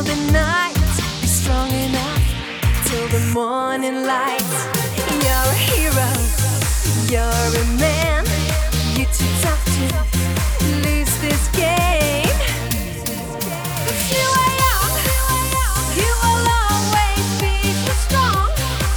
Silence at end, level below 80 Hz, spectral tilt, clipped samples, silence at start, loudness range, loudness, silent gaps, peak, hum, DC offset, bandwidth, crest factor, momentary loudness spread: 0 s; -22 dBFS; -4 dB/octave; under 0.1%; 0 s; 2 LU; -18 LUFS; none; -2 dBFS; none; under 0.1%; over 20 kHz; 16 dB; 5 LU